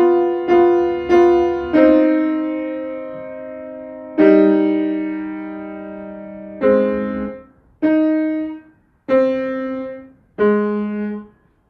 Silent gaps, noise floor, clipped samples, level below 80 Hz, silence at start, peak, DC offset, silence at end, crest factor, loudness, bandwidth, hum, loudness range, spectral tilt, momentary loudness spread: none; -48 dBFS; under 0.1%; -50 dBFS; 0 s; 0 dBFS; under 0.1%; 0.45 s; 18 dB; -17 LUFS; 6.4 kHz; none; 5 LU; -8.5 dB/octave; 19 LU